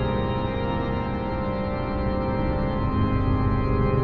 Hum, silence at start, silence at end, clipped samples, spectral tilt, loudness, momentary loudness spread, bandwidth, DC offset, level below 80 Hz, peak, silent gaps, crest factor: none; 0 s; 0 s; under 0.1%; -10 dB/octave; -25 LUFS; 4 LU; 5 kHz; under 0.1%; -30 dBFS; -10 dBFS; none; 14 dB